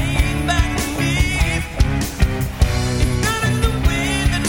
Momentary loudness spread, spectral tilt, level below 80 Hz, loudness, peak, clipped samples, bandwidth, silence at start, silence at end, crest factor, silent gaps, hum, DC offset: 2 LU; -4.5 dB/octave; -22 dBFS; -19 LUFS; -2 dBFS; under 0.1%; 17 kHz; 0 s; 0 s; 16 dB; none; none; under 0.1%